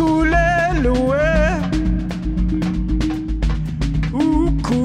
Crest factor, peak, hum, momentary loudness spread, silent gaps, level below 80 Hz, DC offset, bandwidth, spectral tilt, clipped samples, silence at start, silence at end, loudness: 12 dB; -4 dBFS; none; 7 LU; none; -22 dBFS; under 0.1%; 10 kHz; -7 dB/octave; under 0.1%; 0 s; 0 s; -19 LUFS